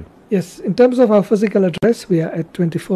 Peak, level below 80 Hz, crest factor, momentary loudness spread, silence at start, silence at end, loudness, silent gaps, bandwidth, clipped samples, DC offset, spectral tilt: -2 dBFS; -52 dBFS; 12 dB; 9 LU; 0 s; 0 s; -16 LUFS; none; 13.5 kHz; under 0.1%; under 0.1%; -7.5 dB/octave